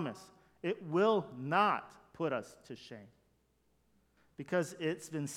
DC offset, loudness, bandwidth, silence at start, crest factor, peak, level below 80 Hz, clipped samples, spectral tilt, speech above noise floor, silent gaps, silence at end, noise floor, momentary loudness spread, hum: under 0.1%; -35 LUFS; 16 kHz; 0 s; 20 dB; -16 dBFS; -78 dBFS; under 0.1%; -5.5 dB/octave; 39 dB; none; 0 s; -74 dBFS; 21 LU; none